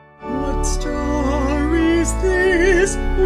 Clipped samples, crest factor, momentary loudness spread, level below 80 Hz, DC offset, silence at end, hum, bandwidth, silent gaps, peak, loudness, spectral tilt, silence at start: under 0.1%; 14 dB; 8 LU; -24 dBFS; under 0.1%; 0 s; none; 14 kHz; none; -4 dBFS; -18 LUFS; -5 dB/octave; 0.2 s